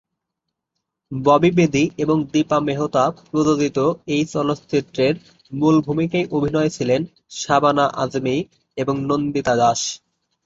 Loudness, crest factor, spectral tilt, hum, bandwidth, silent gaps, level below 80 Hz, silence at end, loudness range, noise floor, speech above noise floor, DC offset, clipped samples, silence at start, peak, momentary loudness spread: -19 LUFS; 18 dB; -5.5 dB/octave; none; 8 kHz; none; -54 dBFS; 0.5 s; 2 LU; -80 dBFS; 62 dB; under 0.1%; under 0.1%; 1.1 s; -2 dBFS; 9 LU